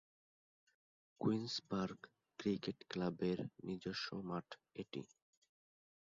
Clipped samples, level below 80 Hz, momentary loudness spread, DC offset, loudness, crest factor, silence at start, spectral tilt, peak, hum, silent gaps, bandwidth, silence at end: under 0.1%; -76 dBFS; 12 LU; under 0.1%; -43 LUFS; 20 dB; 1.2 s; -5 dB/octave; -24 dBFS; none; none; 7.4 kHz; 1 s